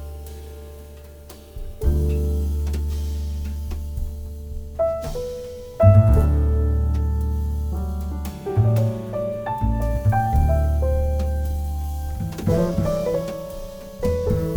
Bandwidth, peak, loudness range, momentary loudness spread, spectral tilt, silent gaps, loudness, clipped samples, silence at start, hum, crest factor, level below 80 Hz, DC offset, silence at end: 19 kHz; -2 dBFS; 6 LU; 18 LU; -8.5 dB/octave; none; -23 LUFS; under 0.1%; 0 s; none; 20 dB; -24 dBFS; under 0.1%; 0 s